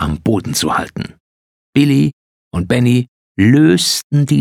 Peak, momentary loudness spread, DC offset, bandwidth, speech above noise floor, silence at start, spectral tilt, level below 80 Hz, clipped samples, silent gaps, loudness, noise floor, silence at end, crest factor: 0 dBFS; 15 LU; under 0.1%; 17.5 kHz; over 77 dB; 0 s; -5.5 dB/octave; -38 dBFS; under 0.1%; 1.20-1.73 s, 2.13-2.51 s, 3.08-3.35 s, 4.04-4.10 s; -14 LUFS; under -90 dBFS; 0 s; 14 dB